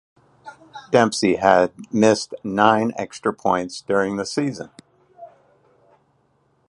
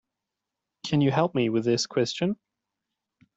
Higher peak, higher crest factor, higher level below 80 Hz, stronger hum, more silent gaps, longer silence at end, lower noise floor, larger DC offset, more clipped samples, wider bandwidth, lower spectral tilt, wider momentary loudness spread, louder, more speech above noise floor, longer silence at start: first, 0 dBFS vs -8 dBFS; about the same, 22 dB vs 18 dB; first, -58 dBFS vs -66 dBFS; neither; neither; first, 1.4 s vs 1 s; second, -63 dBFS vs -86 dBFS; neither; neither; first, 11.5 kHz vs 8.2 kHz; about the same, -5 dB/octave vs -5.5 dB/octave; about the same, 10 LU vs 8 LU; first, -20 LUFS vs -25 LUFS; second, 44 dB vs 62 dB; second, 0.45 s vs 0.85 s